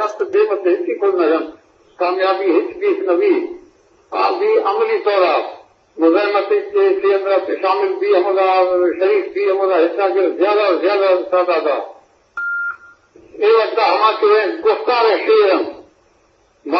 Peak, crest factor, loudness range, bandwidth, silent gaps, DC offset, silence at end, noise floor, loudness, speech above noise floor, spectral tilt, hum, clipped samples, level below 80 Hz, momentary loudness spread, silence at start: 0 dBFS; 16 dB; 3 LU; 6.4 kHz; none; under 0.1%; 0 s; -56 dBFS; -16 LUFS; 41 dB; -4.5 dB/octave; none; under 0.1%; -66 dBFS; 8 LU; 0 s